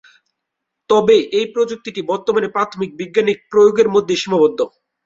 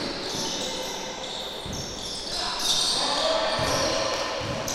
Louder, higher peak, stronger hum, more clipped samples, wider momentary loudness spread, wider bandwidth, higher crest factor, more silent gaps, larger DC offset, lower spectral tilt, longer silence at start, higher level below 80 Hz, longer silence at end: first, -16 LUFS vs -26 LUFS; first, -2 dBFS vs -12 dBFS; neither; neither; about the same, 10 LU vs 10 LU; second, 7.8 kHz vs 16 kHz; about the same, 14 dB vs 16 dB; neither; neither; first, -5 dB/octave vs -2 dB/octave; first, 0.9 s vs 0 s; second, -60 dBFS vs -48 dBFS; first, 0.35 s vs 0 s